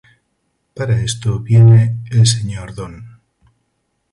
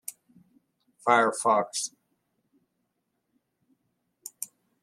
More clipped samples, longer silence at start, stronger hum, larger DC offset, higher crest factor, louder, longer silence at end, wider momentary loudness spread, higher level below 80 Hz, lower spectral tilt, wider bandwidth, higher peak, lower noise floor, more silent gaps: neither; first, 0.75 s vs 0.1 s; neither; neither; second, 14 dB vs 26 dB; first, -14 LUFS vs -25 LUFS; first, 1.05 s vs 0.35 s; about the same, 20 LU vs 20 LU; first, -42 dBFS vs -84 dBFS; first, -5.5 dB/octave vs -2.5 dB/octave; second, 11.5 kHz vs 16 kHz; first, 0 dBFS vs -6 dBFS; second, -68 dBFS vs -79 dBFS; neither